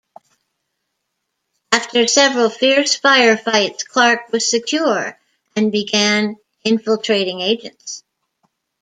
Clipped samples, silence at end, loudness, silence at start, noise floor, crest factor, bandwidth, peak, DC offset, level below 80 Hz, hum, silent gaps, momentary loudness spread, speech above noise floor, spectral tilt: under 0.1%; 0.8 s; -15 LUFS; 1.7 s; -75 dBFS; 18 dB; 9.6 kHz; 0 dBFS; under 0.1%; -68 dBFS; none; none; 12 LU; 59 dB; -2 dB/octave